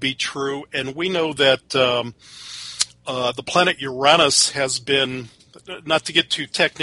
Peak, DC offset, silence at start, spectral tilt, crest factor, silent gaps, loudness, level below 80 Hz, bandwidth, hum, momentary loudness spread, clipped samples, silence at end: -2 dBFS; under 0.1%; 0 s; -2 dB/octave; 20 dB; none; -19 LUFS; -58 dBFS; 11.5 kHz; none; 18 LU; under 0.1%; 0 s